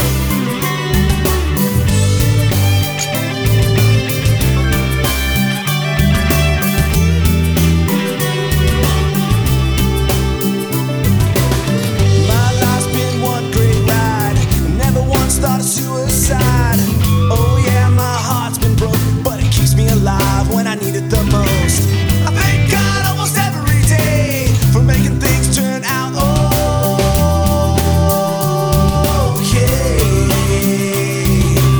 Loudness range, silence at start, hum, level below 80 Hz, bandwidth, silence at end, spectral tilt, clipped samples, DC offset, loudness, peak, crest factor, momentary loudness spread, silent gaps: 1 LU; 0 s; none; -20 dBFS; over 20 kHz; 0 s; -5 dB/octave; under 0.1%; under 0.1%; -14 LUFS; 0 dBFS; 12 dB; 4 LU; none